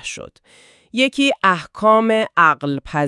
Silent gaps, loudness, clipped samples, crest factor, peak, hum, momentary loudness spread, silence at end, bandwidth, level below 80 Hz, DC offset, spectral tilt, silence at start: none; -16 LUFS; under 0.1%; 18 dB; 0 dBFS; none; 12 LU; 0 s; 11.5 kHz; -52 dBFS; under 0.1%; -4.5 dB/octave; 0.05 s